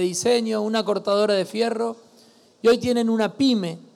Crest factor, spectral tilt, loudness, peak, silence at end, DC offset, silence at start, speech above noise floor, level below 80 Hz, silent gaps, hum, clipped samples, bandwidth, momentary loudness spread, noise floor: 12 dB; -4.5 dB/octave; -22 LUFS; -10 dBFS; 0.15 s; under 0.1%; 0 s; 32 dB; -66 dBFS; none; none; under 0.1%; 14.5 kHz; 5 LU; -54 dBFS